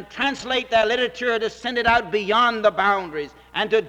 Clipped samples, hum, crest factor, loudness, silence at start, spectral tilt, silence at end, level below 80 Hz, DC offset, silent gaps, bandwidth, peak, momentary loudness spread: under 0.1%; none; 16 dB; -21 LUFS; 0 s; -3.5 dB/octave; 0 s; -50 dBFS; under 0.1%; none; 10.5 kHz; -6 dBFS; 7 LU